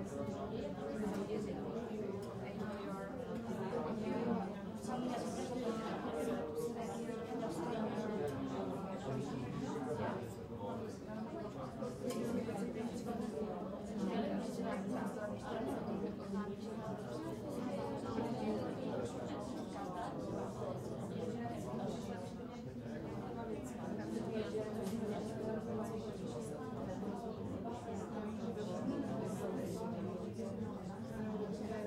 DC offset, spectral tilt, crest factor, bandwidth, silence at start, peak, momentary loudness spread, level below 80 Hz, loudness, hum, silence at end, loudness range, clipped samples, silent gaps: under 0.1%; -6.5 dB/octave; 16 dB; 16 kHz; 0 s; -26 dBFS; 5 LU; -64 dBFS; -43 LUFS; none; 0 s; 2 LU; under 0.1%; none